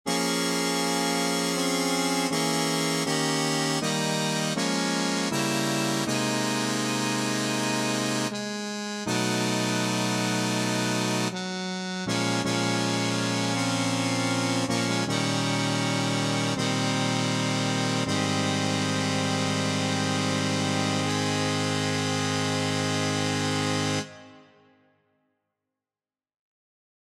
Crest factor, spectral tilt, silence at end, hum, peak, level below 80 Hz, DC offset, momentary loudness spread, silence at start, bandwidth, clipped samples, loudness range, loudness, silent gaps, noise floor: 16 dB; -4 dB/octave; 2.65 s; none; -12 dBFS; -66 dBFS; under 0.1%; 1 LU; 0.05 s; 16 kHz; under 0.1%; 2 LU; -26 LUFS; none; under -90 dBFS